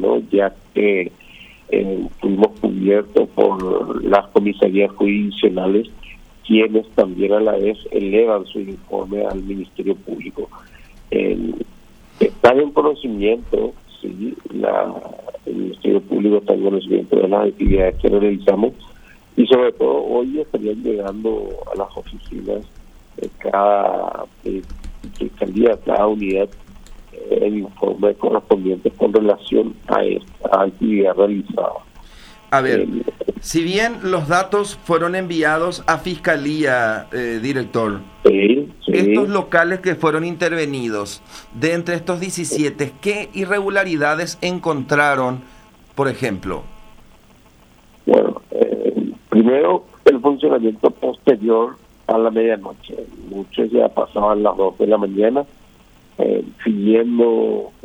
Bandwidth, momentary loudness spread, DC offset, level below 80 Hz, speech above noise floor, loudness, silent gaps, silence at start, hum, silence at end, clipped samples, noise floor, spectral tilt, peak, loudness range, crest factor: 14 kHz; 12 LU; under 0.1%; -38 dBFS; 31 dB; -18 LUFS; none; 0 s; none; 0.15 s; under 0.1%; -49 dBFS; -6 dB/octave; 0 dBFS; 5 LU; 18 dB